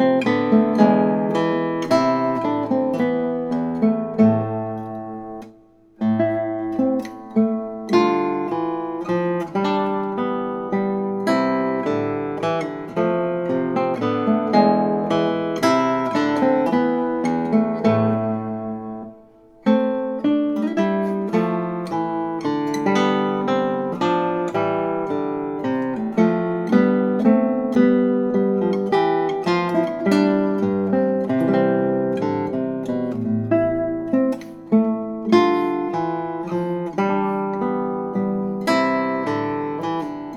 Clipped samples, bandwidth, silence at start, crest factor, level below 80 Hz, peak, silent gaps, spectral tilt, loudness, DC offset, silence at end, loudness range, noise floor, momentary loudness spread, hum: under 0.1%; 12 kHz; 0 s; 20 dB; -60 dBFS; 0 dBFS; none; -7.5 dB/octave; -21 LUFS; under 0.1%; 0 s; 4 LU; -50 dBFS; 7 LU; none